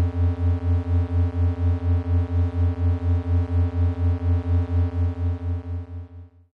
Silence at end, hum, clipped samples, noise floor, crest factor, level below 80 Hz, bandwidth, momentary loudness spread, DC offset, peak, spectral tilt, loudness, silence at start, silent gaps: 0.3 s; none; under 0.1%; -43 dBFS; 8 dB; -30 dBFS; 3.6 kHz; 7 LU; under 0.1%; -14 dBFS; -10.5 dB/octave; -24 LUFS; 0 s; none